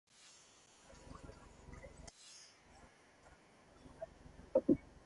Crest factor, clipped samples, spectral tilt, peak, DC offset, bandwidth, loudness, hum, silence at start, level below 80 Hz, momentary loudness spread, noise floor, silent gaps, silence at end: 26 dB; under 0.1%; -6.5 dB/octave; -18 dBFS; under 0.1%; 11.5 kHz; -40 LUFS; none; 1.05 s; -64 dBFS; 27 LU; -65 dBFS; none; 0.3 s